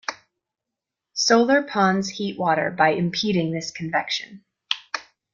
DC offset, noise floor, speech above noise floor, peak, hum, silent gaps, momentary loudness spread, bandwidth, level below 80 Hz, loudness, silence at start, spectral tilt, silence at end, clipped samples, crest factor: under 0.1%; -86 dBFS; 64 dB; -2 dBFS; none; none; 14 LU; 7.4 kHz; -64 dBFS; -22 LUFS; 0.1 s; -4 dB/octave; 0.3 s; under 0.1%; 22 dB